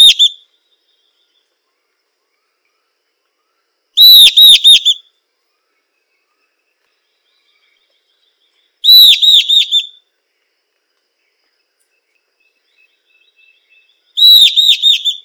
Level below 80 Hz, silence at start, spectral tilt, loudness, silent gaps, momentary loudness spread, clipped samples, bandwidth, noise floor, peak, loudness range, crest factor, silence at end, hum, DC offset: -60 dBFS; 0 s; 4.5 dB/octave; -4 LUFS; none; 13 LU; 3%; over 20 kHz; -66 dBFS; 0 dBFS; 11 LU; 12 dB; 0.05 s; none; under 0.1%